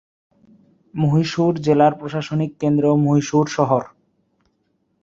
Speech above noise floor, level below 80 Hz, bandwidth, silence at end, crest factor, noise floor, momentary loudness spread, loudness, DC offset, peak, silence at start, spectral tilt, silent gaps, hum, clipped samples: 50 dB; -58 dBFS; 7.6 kHz; 1.15 s; 18 dB; -67 dBFS; 8 LU; -18 LUFS; under 0.1%; -2 dBFS; 0.95 s; -7 dB/octave; none; none; under 0.1%